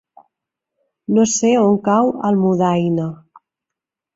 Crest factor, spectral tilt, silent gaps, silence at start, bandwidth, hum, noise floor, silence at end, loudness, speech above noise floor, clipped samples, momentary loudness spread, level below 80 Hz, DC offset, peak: 14 dB; -6 dB/octave; none; 1.1 s; 7.8 kHz; none; -85 dBFS; 1 s; -16 LUFS; 69 dB; under 0.1%; 8 LU; -58 dBFS; under 0.1%; -4 dBFS